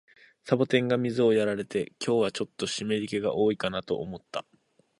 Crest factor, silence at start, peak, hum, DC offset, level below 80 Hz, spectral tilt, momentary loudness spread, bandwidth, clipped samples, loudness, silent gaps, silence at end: 20 dB; 0.45 s; -8 dBFS; none; under 0.1%; -64 dBFS; -5.5 dB/octave; 11 LU; 11.5 kHz; under 0.1%; -28 LUFS; none; 0.6 s